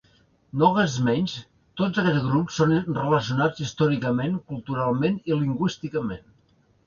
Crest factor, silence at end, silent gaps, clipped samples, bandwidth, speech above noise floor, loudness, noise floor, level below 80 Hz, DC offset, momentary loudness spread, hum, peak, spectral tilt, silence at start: 18 dB; 0.7 s; none; under 0.1%; 7.2 kHz; 39 dB; -24 LUFS; -62 dBFS; -56 dBFS; under 0.1%; 9 LU; none; -6 dBFS; -6.5 dB/octave; 0.55 s